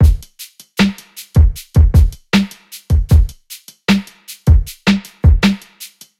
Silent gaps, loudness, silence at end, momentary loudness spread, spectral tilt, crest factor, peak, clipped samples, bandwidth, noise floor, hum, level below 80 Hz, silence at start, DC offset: none; -15 LUFS; 0.35 s; 22 LU; -6 dB/octave; 14 dB; 0 dBFS; under 0.1%; 15 kHz; -38 dBFS; none; -16 dBFS; 0 s; under 0.1%